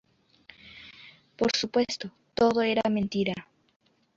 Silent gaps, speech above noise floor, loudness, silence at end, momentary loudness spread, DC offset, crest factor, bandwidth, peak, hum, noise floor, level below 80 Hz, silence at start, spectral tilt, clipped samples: none; 31 dB; -27 LUFS; 0.75 s; 22 LU; under 0.1%; 20 dB; 7.8 kHz; -10 dBFS; none; -57 dBFS; -62 dBFS; 0.65 s; -4.5 dB/octave; under 0.1%